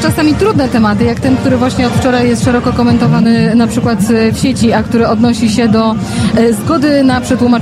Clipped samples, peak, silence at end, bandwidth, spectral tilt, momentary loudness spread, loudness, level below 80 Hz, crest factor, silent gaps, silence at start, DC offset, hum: under 0.1%; 0 dBFS; 0 s; 14 kHz; -6 dB/octave; 3 LU; -10 LUFS; -32 dBFS; 8 dB; none; 0 s; under 0.1%; none